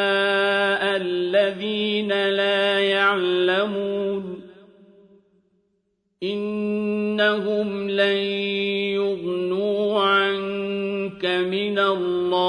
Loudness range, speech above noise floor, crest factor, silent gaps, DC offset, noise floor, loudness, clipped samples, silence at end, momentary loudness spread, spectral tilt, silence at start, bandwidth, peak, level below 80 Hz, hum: 7 LU; 50 dB; 16 dB; none; under 0.1%; -71 dBFS; -22 LUFS; under 0.1%; 0 s; 7 LU; -5.5 dB/octave; 0 s; 10 kHz; -8 dBFS; -66 dBFS; none